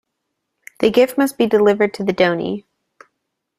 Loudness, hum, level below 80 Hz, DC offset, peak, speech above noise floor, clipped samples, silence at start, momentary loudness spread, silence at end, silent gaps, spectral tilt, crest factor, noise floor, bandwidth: -17 LUFS; none; -58 dBFS; under 0.1%; -2 dBFS; 60 dB; under 0.1%; 0.8 s; 9 LU; 1 s; none; -5.5 dB/octave; 18 dB; -76 dBFS; 15.5 kHz